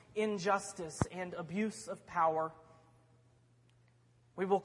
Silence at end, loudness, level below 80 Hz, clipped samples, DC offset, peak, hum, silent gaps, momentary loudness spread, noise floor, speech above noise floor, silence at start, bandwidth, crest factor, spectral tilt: 0 s; -37 LUFS; -64 dBFS; under 0.1%; under 0.1%; -18 dBFS; none; none; 10 LU; -68 dBFS; 32 dB; 0.15 s; 11.5 kHz; 20 dB; -5.5 dB/octave